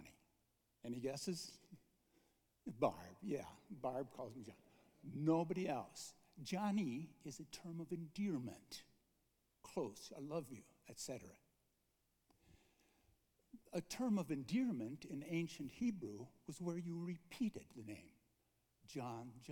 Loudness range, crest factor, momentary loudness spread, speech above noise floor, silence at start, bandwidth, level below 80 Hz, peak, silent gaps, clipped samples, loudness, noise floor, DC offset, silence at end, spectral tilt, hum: 8 LU; 24 dB; 16 LU; 38 dB; 0 s; 19 kHz; -80 dBFS; -22 dBFS; none; under 0.1%; -46 LUFS; -83 dBFS; under 0.1%; 0 s; -6 dB/octave; none